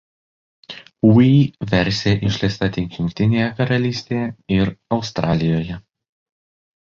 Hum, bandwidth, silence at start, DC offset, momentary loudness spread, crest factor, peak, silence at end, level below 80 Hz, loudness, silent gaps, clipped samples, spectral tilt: none; 7.4 kHz; 0.7 s; under 0.1%; 11 LU; 16 dB; -2 dBFS; 1.15 s; -42 dBFS; -18 LUFS; none; under 0.1%; -7 dB/octave